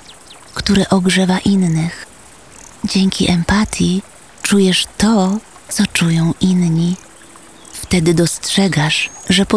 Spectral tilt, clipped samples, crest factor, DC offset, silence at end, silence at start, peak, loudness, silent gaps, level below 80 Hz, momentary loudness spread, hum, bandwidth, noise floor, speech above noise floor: -5 dB/octave; under 0.1%; 14 dB; 0.4%; 0 s; 0.1 s; -2 dBFS; -15 LUFS; none; -38 dBFS; 10 LU; none; 11 kHz; -41 dBFS; 27 dB